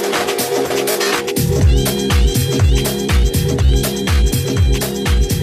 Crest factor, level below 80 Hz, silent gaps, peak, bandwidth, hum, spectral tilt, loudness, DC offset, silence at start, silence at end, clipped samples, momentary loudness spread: 12 dB; -18 dBFS; none; -4 dBFS; 15.5 kHz; none; -5 dB/octave; -16 LUFS; under 0.1%; 0 s; 0 s; under 0.1%; 3 LU